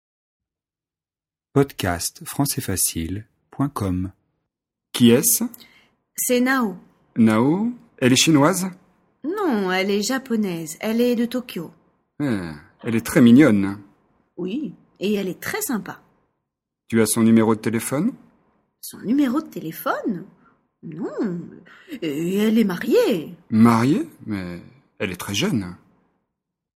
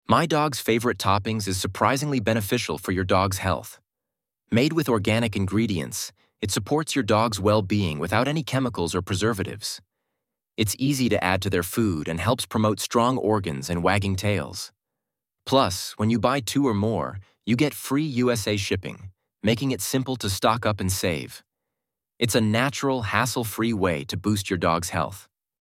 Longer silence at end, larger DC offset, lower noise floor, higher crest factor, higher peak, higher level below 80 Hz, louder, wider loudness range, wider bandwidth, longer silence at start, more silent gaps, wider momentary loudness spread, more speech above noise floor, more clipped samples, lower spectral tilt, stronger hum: first, 1 s vs 0.4 s; neither; about the same, under -90 dBFS vs -87 dBFS; about the same, 22 dB vs 20 dB; first, 0 dBFS vs -4 dBFS; about the same, -54 dBFS vs -54 dBFS; first, -21 LUFS vs -24 LUFS; first, 7 LU vs 2 LU; about the same, 16.5 kHz vs 17 kHz; first, 1.55 s vs 0.1 s; neither; first, 17 LU vs 8 LU; first, over 70 dB vs 63 dB; neither; about the same, -4.5 dB/octave vs -5 dB/octave; neither